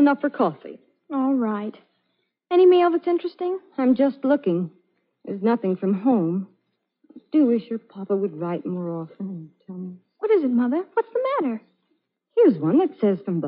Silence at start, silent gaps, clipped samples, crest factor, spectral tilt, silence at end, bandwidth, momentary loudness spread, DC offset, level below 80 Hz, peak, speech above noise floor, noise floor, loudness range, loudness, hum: 0 s; none; under 0.1%; 16 dB; -7 dB/octave; 0 s; 5 kHz; 17 LU; under 0.1%; -82 dBFS; -8 dBFS; 52 dB; -74 dBFS; 5 LU; -22 LUFS; none